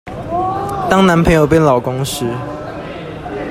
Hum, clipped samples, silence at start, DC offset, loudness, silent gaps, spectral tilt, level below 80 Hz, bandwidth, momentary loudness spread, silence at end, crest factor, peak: none; under 0.1%; 0.05 s; under 0.1%; -14 LUFS; none; -6 dB/octave; -34 dBFS; 16 kHz; 16 LU; 0 s; 14 dB; 0 dBFS